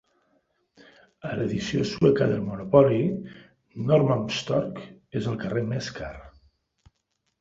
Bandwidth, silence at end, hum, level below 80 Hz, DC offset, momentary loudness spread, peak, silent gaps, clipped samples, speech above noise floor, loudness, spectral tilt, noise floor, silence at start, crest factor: 7.8 kHz; 1.1 s; none; -54 dBFS; under 0.1%; 19 LU; -4 dBFS; none; under 0.1%; 52 dB; -25 LUFS; -7 dB/octave; -76 dBFS; 1.25 s; 24 dB